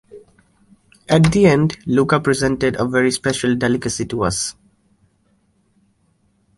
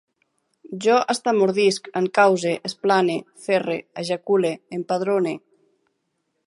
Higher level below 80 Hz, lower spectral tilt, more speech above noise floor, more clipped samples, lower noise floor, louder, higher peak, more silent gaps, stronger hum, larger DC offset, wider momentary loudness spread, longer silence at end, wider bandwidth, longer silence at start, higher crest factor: first, -44 dBFS vs -74 dBFS; about the same, -5.5 dB/octave vs -4.5 dB/octave; second, 45 dB vs 53 dB; neither; second, -61 dBFS vs -74 dBFS; first, -17 LUFS vs -21 LUFS; about the same, -2 dBFS vs -2 dBFS; neither; neither; neither; about the same, 8 LU vs 10 LU; first, 2.05 s vs 1.1 s; about the same, 11.5 kHz vs 11.5 kHz; second, 0.15 s vs 0.7 s; about the same, 18 dB vs 20 dB